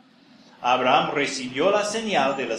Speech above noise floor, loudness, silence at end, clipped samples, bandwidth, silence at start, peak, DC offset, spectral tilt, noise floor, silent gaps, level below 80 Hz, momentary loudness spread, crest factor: 31 dB; -22 LUFS; 0 s; under 0.1%; 12 kHz; 0.6 s; -4 dBFS; under 0.1%; -3.5 dB/octave; -53 dBFS; none; -70 dBFS; 6 LU; 20 dB